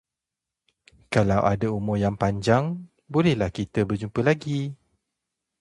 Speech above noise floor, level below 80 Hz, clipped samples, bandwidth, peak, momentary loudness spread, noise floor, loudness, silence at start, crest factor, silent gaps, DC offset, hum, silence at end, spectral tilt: 64 dB; -48 dBFS; under 0.1%; 11.5 kHz; -4 dBFS; 8 LU; -87 dBFS; -24 LUFS; 1.1 s; 20 dB; none; under 0.1%; none; 0.85 s; -7 dB/octave